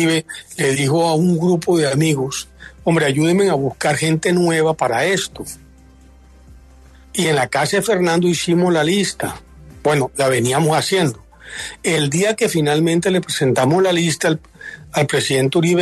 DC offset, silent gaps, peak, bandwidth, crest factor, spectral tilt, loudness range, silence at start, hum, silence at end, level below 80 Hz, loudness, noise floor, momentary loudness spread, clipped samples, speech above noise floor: under 0.1%; none; -4 dBFS; 13.5 kHz; 14 dB; -5 dB/octave; 3 LU; 0 s; none; 0 s; -48 dBFS; -17 LUFS; -45 dBFS; 11 LU; under 0.1%; 28 dB